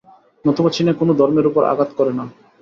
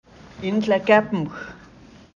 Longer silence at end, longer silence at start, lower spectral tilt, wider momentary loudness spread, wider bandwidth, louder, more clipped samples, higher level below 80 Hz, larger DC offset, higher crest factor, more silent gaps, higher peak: second, 0.3 s vs 0.6 s; about the same, 0.45 s vs 0.35 s; about the same, -7.5 dB/octave vs -6.5 dB/octave; second, 7 LU vs 18 LU; about the same, 7.4 kHz vs 7.4 kHz; first, -17 LUFS vs -21 LUFS; neither; about the same, -58 dBFS vs -56 dBFS; neither; second, 14 dB vs 20 dB; neither; about the same, -2 dBFS vs -4 dBFS